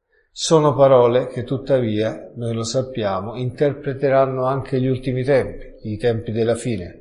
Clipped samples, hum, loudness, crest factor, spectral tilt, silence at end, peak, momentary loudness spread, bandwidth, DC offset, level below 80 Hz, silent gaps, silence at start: under 0.1%; none; -19 LUFS; 16 dB; -6 dB/octave; 0.05 s; -2 dBFS; 12 LU; 11.5 kHz; under 0.1%; -46 dBFS; none; 0.35 s